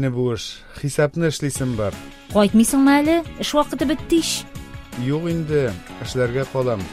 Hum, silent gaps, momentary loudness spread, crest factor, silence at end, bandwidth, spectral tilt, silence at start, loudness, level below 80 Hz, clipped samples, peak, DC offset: none; none; 14 LU; 16 dB; 0 s; 16 kHz; -5 dB/octave; 0 s; -20 LUFS; -42 dBFS; under 0.1%; -4 dBFS; under 0.1%